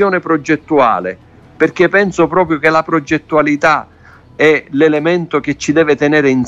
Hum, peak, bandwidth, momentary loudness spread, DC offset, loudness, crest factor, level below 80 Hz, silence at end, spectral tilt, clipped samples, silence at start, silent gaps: none; 0 dBFS; 8 kHz; 5 LU; under 0.1%; -12 LUFS; 12 dB; -48 dBFS; 0 s; -6 dB/octave; under 0.1%; 0 s; none